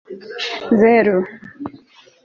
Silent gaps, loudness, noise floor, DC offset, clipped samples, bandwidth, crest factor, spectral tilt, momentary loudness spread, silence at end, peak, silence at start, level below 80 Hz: none; -16 LUFS; -46 dBFS; under 0.1%; under 0.1%; 7.2 kHz; 16 dB; -6.5 dB/octave; 21 LU; 0.5 s; -2 dBFS; 0.1 s; -60 dBFS